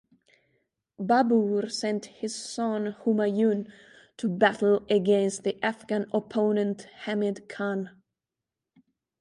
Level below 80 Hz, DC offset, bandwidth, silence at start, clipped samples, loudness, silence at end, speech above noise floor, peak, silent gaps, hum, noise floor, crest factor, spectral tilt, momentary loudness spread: -72 dBFS; under 0.1%; 11.5 kHz; 1 s; under 0.1%; -27 LUFS; 1.3 s; 62 dB; -6 dBFS; none; none; -88 dBFS; 20 dB; -5.5 dB/octave; 11 LU